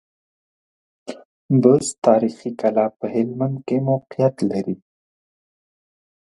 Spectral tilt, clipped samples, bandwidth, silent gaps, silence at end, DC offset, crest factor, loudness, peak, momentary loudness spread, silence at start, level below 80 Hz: -7 dB/octave; under 0.1%; 11.5 kHz; 1.25-1.49 s, 1.98-2.02 s; 1.55 s; under 0.1%; 20 dB; -20 LUFS; -2 dBFS; 17 LU; 1.05 s; -64 dBFS